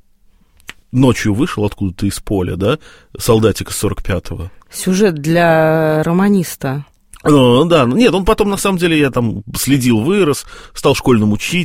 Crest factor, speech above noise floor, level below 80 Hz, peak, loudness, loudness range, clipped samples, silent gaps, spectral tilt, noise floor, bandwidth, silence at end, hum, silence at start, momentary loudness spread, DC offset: 14 dB; 36 dB; -34 dBFS; 0 dBFS; -14 LUFS; 5 LU; under 0.1%; none; -5.5 dB/octave; -50 dBFS; 16.5 kHz; 0 s; none; 0.95 s; 11 LU; 0.3%